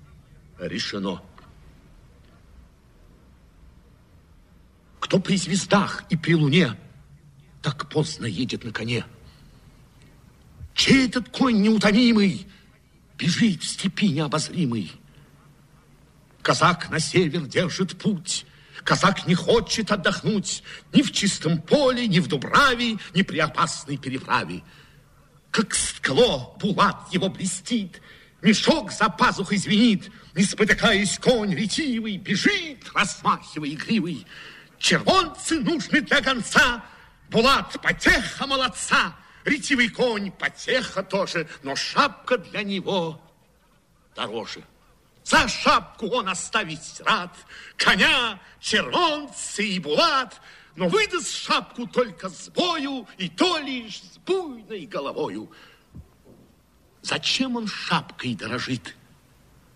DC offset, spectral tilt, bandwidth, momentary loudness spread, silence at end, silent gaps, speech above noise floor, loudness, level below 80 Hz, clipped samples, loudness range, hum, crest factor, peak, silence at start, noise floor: under 0.1%; -4 dB/octave; 14 kHz; 13 LU; 0.85 s; none; 37 dB; -22 LUFS; -50 dBFS; under 0.1%; 7 LU; none; 20 dB; -4 dBFS; 0.6 s; -60 dBFS